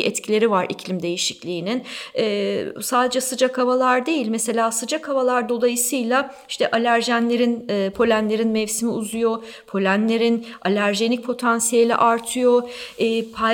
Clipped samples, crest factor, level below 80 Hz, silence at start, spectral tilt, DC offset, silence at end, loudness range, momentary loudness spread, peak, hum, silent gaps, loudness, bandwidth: under 0.1%; 16 dB; -62 dBFS; 0 s; -3.5 dB/octave; under 0.1%; 0 s; 2 LU; 7 LU; -6 dBFS; none; none; -20 LUFS; 19 kHz